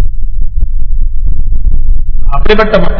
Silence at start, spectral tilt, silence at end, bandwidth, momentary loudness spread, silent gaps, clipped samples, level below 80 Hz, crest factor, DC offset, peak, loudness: 0 s; -8 dB/octave; 0 s; 5 kHz; 10 LU; none; 20%; -8 dBFS; 4 dB; under 0.1%; 0 dBFS; -14 LUFS